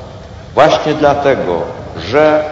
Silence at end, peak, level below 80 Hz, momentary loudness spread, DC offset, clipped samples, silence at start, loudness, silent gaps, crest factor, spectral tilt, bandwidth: 0 s; 0 dBFS; -38 dBFS; 14 LU; under 0.1%; 0.2%; 0 s; -12 LUFS; none; 12 dB; -5.5 dB/octave; 7.8 kHz